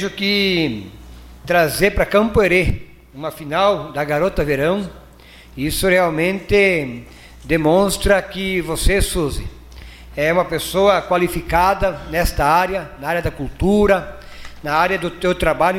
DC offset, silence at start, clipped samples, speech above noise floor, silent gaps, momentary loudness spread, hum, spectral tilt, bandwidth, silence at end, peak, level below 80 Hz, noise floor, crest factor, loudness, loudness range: under 0.1%; 0 s; under 0.1%; 25 dB; none; 15 LU; none; -5 dB/octave; 16.5 kHz; 0 s; -2 dBFS; -30 dBFS; -43 dBFS; 16 dB; -17 LUFS; 2 LU